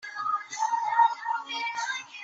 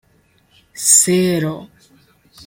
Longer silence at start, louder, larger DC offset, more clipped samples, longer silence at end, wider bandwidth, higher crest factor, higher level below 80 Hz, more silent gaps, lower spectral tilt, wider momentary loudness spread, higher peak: second, 0 s vs 0.75 s; second, -28 LUFS vs -13 LUFS; neither; neither; second, 0 s vs 0.8 s; second, 8 kHz vs 16.5 kHz; about the same, 18 dB vs 20 dB; second, -84 dBFS vs -58 dBFS; neither; second, 1.5 dB/octave vs -3 dB/octave; second, 8 LU vs 15 LU; second, -10 dBFS vs 0 dBFS